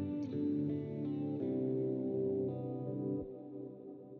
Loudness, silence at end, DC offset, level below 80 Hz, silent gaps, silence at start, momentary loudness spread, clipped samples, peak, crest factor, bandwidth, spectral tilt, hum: -38 LUFS; 0 s; under 0.1%; -74 dBFS; none; 0 s; 12 LU; under 0.1%; -26 dBFS; 12 dB; 4.5 kHz; -11 dB/octave; none